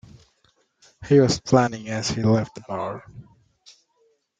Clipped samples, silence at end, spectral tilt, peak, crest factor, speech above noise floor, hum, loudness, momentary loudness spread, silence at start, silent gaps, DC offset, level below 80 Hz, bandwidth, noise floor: under 0.1%; 1.2 s; -6 dB/octave; -2 dBFS; 22 dB; 45 dB; none; -22 LUFS; 14 LU; 1 s; none; under 0.1%; -54 dBFS; 9.4 kHz; -66 dBFS